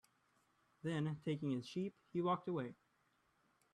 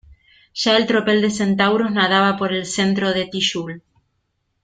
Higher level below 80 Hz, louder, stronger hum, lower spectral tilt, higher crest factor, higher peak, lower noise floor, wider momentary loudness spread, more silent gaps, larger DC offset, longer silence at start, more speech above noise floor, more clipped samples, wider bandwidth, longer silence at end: second, -82 dBFS vs -56 dBFS; second, -43 LUFS vs -18 LUFS; neither; first, -7.5 dB/octave vs -4 dB/octave; about the same, 18 dB vs 18 dB; second, -26 dBFS vs -2 dBFS; first, -79 dBFS vs -70 dBFS; second, 6 LU vs 10 LU; neither; neither; first, 0.85 s vs 0.55 s; second, 37 dB vs 52 dB; neither; first, 11 kHz vs 9.4 kHz; first, 1 s vs 0.85 s